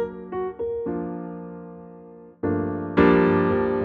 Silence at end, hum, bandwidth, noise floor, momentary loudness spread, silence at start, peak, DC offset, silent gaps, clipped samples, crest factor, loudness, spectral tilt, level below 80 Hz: 0 s; none; 4.9 kHz; -45 dBFS; 22 LU; 0 s; -6 dBFS; under 0.1%; none; under 0.1%; 18 dB; -23 LUFS; -10 dB/octave; -48 dBFS